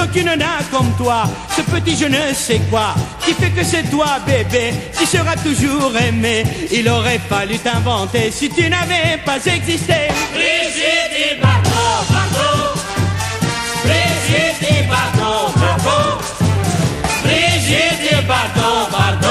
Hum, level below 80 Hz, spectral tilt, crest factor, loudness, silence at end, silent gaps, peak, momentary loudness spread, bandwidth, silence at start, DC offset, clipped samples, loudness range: none; -36 dBFS; -4 dB/octave; 14 dB; -15 LUFS; 0 s; none; 0 dBFS; 4 LU; 15 kHz; 0 s; under 0.1%; under 0.1%; 1 LU